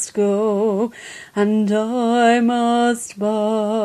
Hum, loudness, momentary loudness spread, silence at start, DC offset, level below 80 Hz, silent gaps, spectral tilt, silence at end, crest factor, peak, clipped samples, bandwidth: none; -18 LUFS; 8 LU; 0 s; under 0.1%; -64 dBFS; none; -5 dB/octave; 0 s; 14 dB; -4 dBFS; under 0.1%; 13 kHz